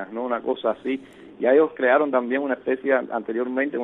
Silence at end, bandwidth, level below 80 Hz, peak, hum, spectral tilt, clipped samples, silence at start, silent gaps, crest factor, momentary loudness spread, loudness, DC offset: 0 s; 4 kHz; -70 dBFS; -6 dBFS; none; -7.5 dB/octave; under 0.1%; 0 s; none; 16 dB; 9 LU; -23 LUFS; under 0.1%